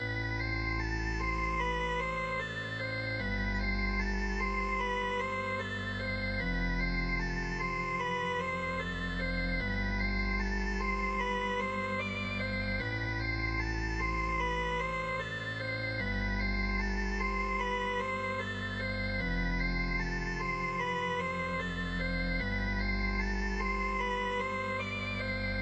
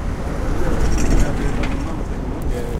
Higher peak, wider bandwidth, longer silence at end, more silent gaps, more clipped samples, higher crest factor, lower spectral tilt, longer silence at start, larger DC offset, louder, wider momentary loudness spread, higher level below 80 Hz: second, -20 dBFS vs -2 dBFS; second, 8.4 kHz vs 12.5 kHz; about the same, 0 s vs 0 s; neither; neither; about the same, 14 dB vs 16 dB; about the same, -5.5 dB/octave vs -6 dB/octave; about the same, 0 s vs 0 s; neither; second, -33 LUFS vs -23 LUFS; second, 2 LU vs 6 LU; second, -40 dBFS vs -20 dBFS